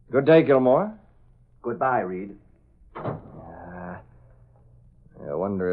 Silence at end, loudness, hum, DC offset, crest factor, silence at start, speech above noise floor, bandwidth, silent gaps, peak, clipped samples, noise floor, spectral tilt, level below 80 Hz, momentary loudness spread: 0 s; -23 LUFS; none; under 0.1%; 20 dB; 0.1 s; 34 dB; 5 kHz; none; -4 dBFS; under 0.1%; -55 dBFS; -11 dB/octave; -56 dBFS; 25 LU